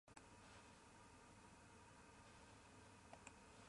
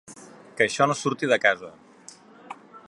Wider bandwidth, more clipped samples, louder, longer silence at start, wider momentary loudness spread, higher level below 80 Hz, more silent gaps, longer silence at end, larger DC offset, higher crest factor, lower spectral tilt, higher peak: about the same, 11.5 kHz vs 11.5 kHz; neither; second, -65 LUFS vs -23 LUFS; about the same, 0.05 s vs 0.1 s; second, 3 LU vs 24 LU; about the same, -76 dBFS vs -72 dBFS; neither; about the same, 0 s vs 0.1 s; neither; about the same, 26 dB vs 22 dB; about the same, -3.5 dB/octave vs -4 dB/octave; second, -40 dBFS vs -4 dBFS